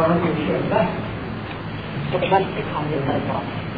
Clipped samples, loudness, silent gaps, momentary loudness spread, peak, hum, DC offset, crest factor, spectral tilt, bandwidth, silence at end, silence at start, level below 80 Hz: under 0.1%; -23 LUFS; none; 10 LU; -4 dBFS; none; 0.3%; 18 dB; -10 dB/octave; 5 kHz; 0 s; 0 s; -44 dBFS